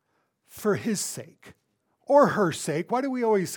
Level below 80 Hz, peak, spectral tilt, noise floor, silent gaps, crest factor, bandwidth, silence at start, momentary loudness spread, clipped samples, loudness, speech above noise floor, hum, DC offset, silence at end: -72 dBFS; -6 dBFS; -5 dB/octave; -70 dBFS; none; 20 dB; 19 kHz; 0.55 s; 10 LU; under 0.1%; -25 LUFS; 46 dB; none; under 0.1%; 0 s